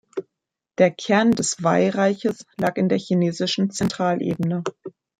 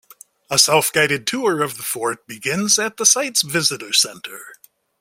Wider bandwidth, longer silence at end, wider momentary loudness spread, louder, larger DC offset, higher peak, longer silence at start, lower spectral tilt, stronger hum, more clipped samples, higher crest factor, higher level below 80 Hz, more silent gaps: second, 11 kHz vs 16.5 kHz; second, 0.3 s vs 0.45 s; about the same, 12 LU vs 11 LU; second, -21 LUFS vs -17 LUFS; neither; second, -4 dBFS vs 0 dBFS; second, 0.15 s vs 0.5 s; first, -5 dB/octave vs -1.5 dB/octave; neither; neither; about the same, 18 dB vs 20 dB; about the same, -60 dBFS vs -62 dBFS; neither